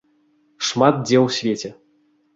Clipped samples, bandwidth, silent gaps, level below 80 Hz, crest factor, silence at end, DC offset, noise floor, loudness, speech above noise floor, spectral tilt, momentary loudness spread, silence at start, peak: under 0.1%; 8 kHz; none; -62 dBFS; 20 dB; 0.65 s; under 0.1%; -61 dBFS; -19 LUFS; 43 dB; -5 dB/octave; 11 LU; 0.6 s; -2 dBFS